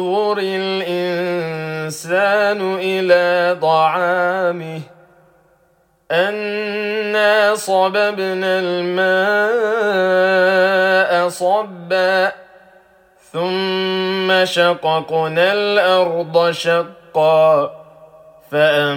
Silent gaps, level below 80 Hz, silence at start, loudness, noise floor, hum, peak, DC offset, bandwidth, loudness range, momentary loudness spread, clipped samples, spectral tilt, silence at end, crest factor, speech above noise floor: none; -68 dBFS; 0 s; -16 LUFS; -58 dBFS; none; -2 dBFS; under 0.1%; 17 kHz; 4 LU; 8 LU; under 0.1%; -4.5 dB/octave; 0 s; 16 dB; 42 dB